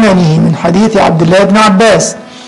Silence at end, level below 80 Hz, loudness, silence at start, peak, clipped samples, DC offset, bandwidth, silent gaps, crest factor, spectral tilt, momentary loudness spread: 0 s; -38 dBFS; -7 LUFS; 0 s; 0 dBFS; under 0.1%; 0.6%; 11.5 kHz; none; 6 dB; -5.5 dB/octave; 4 LU